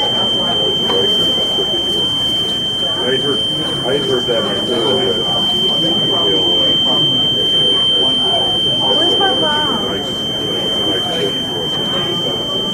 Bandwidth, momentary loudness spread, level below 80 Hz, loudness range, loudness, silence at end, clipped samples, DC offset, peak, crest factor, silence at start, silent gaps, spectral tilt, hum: 16.5 kHz; 6 LU; -44 dBFS; 3 LU; -13 LUFS; 0 s; under 0.1%; under 0.1%; -2 dBFS; 12 dB; 0 s; none; -3.5 dB/octave; none